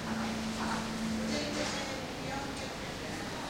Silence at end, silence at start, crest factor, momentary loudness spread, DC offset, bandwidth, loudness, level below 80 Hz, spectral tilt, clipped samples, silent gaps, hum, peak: 0 s; 0 s; 16 dB; 5 LU; under 0.1%; 16 kHz; -36 LUFS; -52 dBFS; -4 dB/octave; under 0.1%; none; none; -20 dBFS